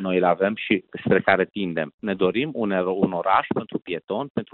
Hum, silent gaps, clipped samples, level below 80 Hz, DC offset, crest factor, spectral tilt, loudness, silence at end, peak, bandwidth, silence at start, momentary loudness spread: none; 1.94-1.98 s, 4.30-4.35 s; under 0.1%; -62 dBFS; under 0.1%; 18 dB; -10.5 dB/octave; -23 LUFS; 0.1 s; -6 dBFS; 4.3 kHz; 0 s; 8 LU